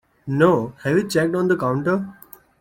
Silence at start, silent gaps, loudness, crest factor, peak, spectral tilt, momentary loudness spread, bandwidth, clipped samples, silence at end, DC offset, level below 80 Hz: 0.25 s; none; -20 LUFS; 18 dB; -4 dBFS; -6.5 dB/octave; 8 LU; 16.5 kHz; under 0.1%; 0.5 s; under 0.1%; -58 dBFS